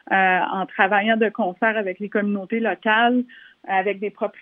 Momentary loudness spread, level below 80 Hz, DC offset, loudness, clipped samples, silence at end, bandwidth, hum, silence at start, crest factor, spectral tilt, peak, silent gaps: 8 LU; -80 dBFS; under 0.1%; -21 LUFS; under 0.1%; 0.1 s; 3.9 kHz; none; 0.1 s; 20 dB; -8.5 dB/octave; -2 dBFS; none